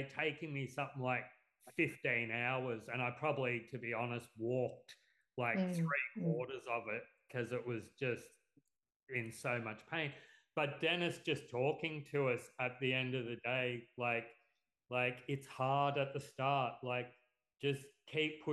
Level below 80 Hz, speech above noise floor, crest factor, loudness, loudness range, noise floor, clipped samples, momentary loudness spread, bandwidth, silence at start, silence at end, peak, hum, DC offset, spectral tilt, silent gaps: -84 dBFS; 42 dB; 18 dB; -39 LUFS; 4 LU; -81 dBFS; under 0.1%; 8 LU; 12 kHz; 0 s; 0 s; -22 dBFS; none; under 0.1%; -6 dB/octave; 8.96-9.07 s